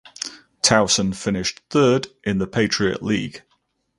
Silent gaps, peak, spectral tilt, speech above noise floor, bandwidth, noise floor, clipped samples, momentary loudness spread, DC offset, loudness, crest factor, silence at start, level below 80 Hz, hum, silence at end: none; 0 dBFS; -3.5 dB/octave; 47 dB; 11.5 kHz; -68 dBFS; under 0.1%; 14 LU; under 0.1%; -20 LUFS; 22 dB; 0.2 s; -50 dBFS; none; 0.6 s